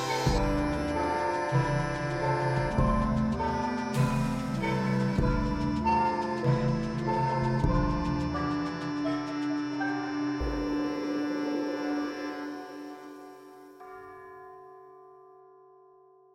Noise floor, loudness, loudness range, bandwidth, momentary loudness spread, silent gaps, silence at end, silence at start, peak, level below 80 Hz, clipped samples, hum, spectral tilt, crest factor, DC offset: -58 dBFS; -29 LUFS; 12 LU; 15 kHz; 19 LU; none; 1.2 s; 0 s; -14 dBFS; -40 dBFS; under 0.1%; none; -7 dB/octave; 16 dB; under 0.1%